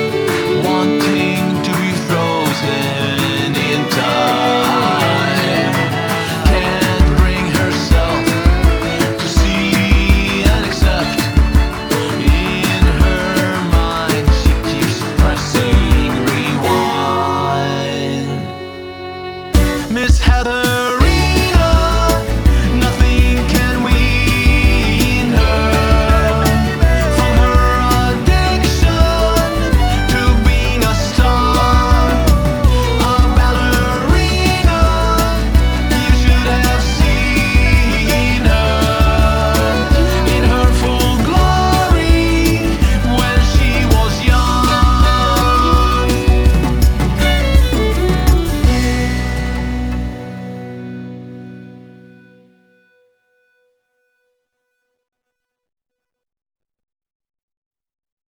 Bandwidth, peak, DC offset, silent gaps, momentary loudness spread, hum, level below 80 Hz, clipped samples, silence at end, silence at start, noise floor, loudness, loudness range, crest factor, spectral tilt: over 20 kHz; 0 dBFS; under 0.1%; none; 5 LU; none; -16 dBFS; under 0.1%; 6.6 s; 0 s; -79 dBFS; -14 LUFS; 4 LU; 12 dB; -5.5 dB/octave